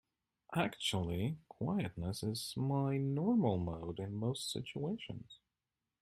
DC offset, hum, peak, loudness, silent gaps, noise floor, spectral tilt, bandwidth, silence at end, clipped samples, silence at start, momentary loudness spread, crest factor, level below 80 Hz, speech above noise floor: under 0.1%; none; -20 dBFS; -38 LUFS; none; under -90 dBFS; -6 dB/octave; 15.5 kHz; 0.65 s; under 0.1%; 0.5 s; 9 LU; 18 dB; -64 dBFS; over 53 dB